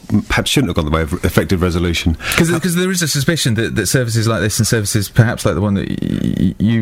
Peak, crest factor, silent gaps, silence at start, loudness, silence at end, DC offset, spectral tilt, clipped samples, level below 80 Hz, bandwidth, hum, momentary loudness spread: 0 dBFS; 16 dB; none; 0.05 s; -16 LUFS; 0 s; under 0.1%; -5 dB/octave; under 0.1%; -30 dBFS; 16.5 kHz; none; 3 LU